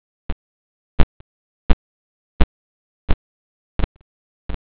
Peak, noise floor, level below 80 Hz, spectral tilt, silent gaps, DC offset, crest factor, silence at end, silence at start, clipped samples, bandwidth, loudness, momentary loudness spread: 0 dBFS; under -90 dBFS; -26 dBFS; -10 dB/octave; 0.32-3.08 s, 3.14-4.49 s; under 0.1%; 20 dB; 0.2 s; 0.3 s; under 0.1%; 4 kHz; -27 LUFS; 14 LU